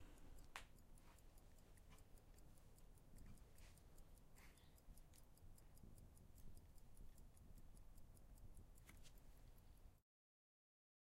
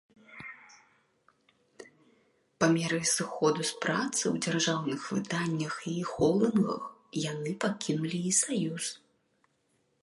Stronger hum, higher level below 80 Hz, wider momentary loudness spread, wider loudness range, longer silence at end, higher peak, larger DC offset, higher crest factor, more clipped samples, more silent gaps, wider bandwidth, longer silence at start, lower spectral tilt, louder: neither; about the same, -66 dBFS vs -68 dBFS; second, 6 LU vs 11 LU; about the same, 2 LU vs 3 LU; about the same, 1 s vs 1.05 s; second, -32 dBFS vs -12 dBFS; neither; first, 30 dB vs 20 dB; neither; neither; first, 16 kHz vs 11.5 kHz; second, 0 s vs 0.3 s; about the same, -4 dB/octave vs -4 dB/octave; second, -68 LUFS vs -30 LUFS